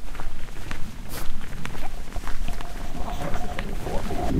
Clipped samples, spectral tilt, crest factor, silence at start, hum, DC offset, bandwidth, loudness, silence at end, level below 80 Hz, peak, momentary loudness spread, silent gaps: under 0.1%; -5.5 dB/octave; 12 dB; 0 s; none; under 0.1%; 14 kHz; -34 LUFS; 0 s; -28 dBFS; -8 dBFS; 6 LU; none